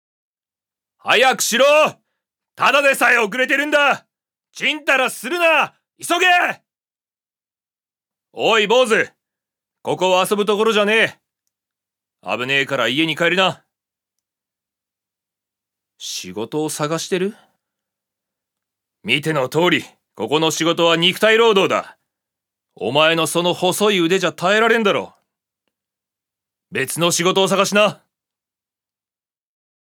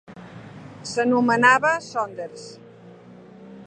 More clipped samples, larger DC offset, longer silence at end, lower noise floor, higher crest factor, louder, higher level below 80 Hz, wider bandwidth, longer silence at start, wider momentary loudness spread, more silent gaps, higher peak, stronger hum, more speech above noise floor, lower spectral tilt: neither; neither; first, 1.95 s vs 0 s; first, under -90 dBFS vs -45 dBFS; about the same, 18 dB vs 22 dB; first, -16 LUFS vs -20 LUFS; second, -76 dBFS vs -66 dBFS; first, 20 kHz vs 9.6 kHz; first, 1.05 s vs 0.1 s; second, 13 LU vs 26 LU; neither; about the same, 0 dBFS vs -2 dBFS; neither; first, over 73 dB vs 25 dB; second, -3 dB/octave vs -4.5 dB/octave